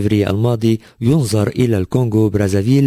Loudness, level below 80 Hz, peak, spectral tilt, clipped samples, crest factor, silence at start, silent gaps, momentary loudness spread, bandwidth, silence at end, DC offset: -16 LUFS; -36 dBFS; -2 dBFS; -7.5 dB/octave; under 0.1%; 12 dB; 0 s; none; 2 LU; 16 kHz; 0 s; under 0.1%